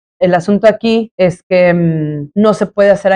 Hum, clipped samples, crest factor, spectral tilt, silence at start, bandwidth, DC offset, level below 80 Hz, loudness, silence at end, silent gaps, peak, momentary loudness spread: none; under 0.1%; 10 dB; -7 dB/octave; 0.2 s; 10 kHz; under 0.1%; -48 dBFS; -12 LUFS; 0 s; 1.11-1.18 s, 1.43-1.50 s; 0 dBFS; 5 LU